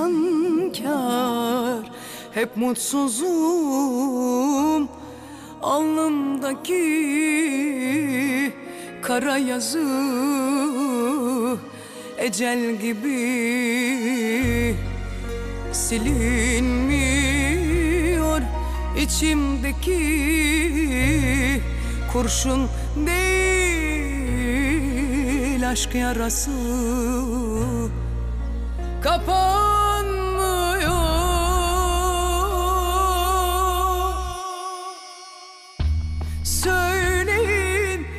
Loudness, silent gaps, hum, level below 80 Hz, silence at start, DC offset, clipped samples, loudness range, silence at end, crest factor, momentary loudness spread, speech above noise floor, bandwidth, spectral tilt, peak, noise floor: -22 LUFS; none; none; -28 dBFS; 0 s; under 0.1%; under 0.1%; 3 LU; 0 s; 14 dB; 10 LU; 21 dB; 15.5 kHz; -4.5 dB/octave; -8 dBFS; -42 dBFS